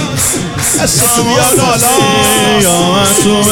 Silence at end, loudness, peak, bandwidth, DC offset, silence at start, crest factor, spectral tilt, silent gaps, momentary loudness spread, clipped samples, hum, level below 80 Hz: 0 s; -8 LUFS; 0 dBFS; 18.5 kHz; under 0.1%; 0 s; 10 dB; -3 dB/octave; none; 4 LU; under 0.1%; none; -34 dBFS